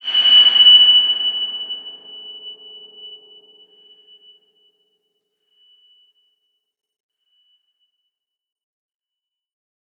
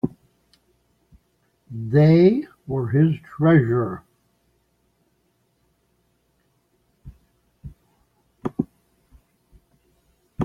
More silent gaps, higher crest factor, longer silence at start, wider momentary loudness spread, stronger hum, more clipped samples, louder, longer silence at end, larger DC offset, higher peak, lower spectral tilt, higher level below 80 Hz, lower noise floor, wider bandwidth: neither; about the same, 18 dB vs 20 dB; about the same, 0.05 s vs 0.05 s; about the same, 27 LU vs 26 LU; second, none vs 60 Hz at -50 dBFS; neither; first, -9 LUFS vs -20 LUFS; first, 6.85 s vs 0 s; neither; about the same, -2 dBFS vs -4 dBFS; second, 0 dB/octave vs -10.5 dB/octave; second, -88 dBFS vs -54 dBFS; first, -86 dBFS vs -67 dBFS; first, 6.2 kHz vs 5.4 kHz